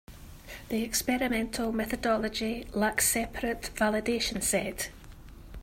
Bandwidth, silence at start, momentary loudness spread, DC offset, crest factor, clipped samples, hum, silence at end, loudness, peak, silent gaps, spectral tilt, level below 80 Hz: 16 kHz; 0.1 s; 13 LU; under 0.1%; 18 dB; under 0.1%; none; 0 s; -29 LUFS; -12 dBFS; none; -3 dB/octave; -48 dBFS